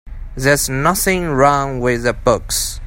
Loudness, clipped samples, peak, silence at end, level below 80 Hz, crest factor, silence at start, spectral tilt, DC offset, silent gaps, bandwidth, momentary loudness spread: -16 LUFS; under 0.1%; 0 dBFS; 0 s; -30 dBFS; 16 dB; 0.05 s; -4 dB/octave; under 0.1%; none; 16.5 kHz; 5 LU